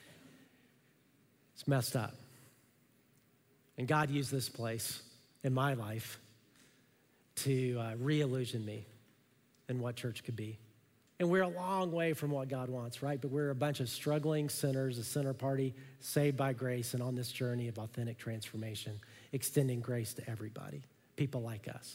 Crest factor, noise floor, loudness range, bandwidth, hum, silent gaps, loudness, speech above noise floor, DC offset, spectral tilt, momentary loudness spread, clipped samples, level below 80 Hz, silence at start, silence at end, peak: 20 dB; -70 dBFS; 4 LU; 16 kHz; none; none; -37 LUFS; 34 dB; under 0.1%; -5.5 dB/octave; 12 LU; under 0.1%; -76 dBFS; 0 s; 0 s; -18 dBFS